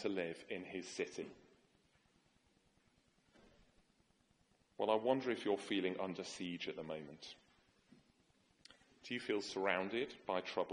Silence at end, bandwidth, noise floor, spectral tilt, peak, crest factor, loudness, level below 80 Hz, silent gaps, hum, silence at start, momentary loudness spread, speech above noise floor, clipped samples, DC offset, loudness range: 0 s; 11 kHz; -76 dBFS; -4.5 dB/octave; -18 dBFS; 26 dB; -41 LUFS; -80 dBFS; none; none; 0 s; 14 LU; 35 dB; under 0.1%; under 0.1%; 10 LU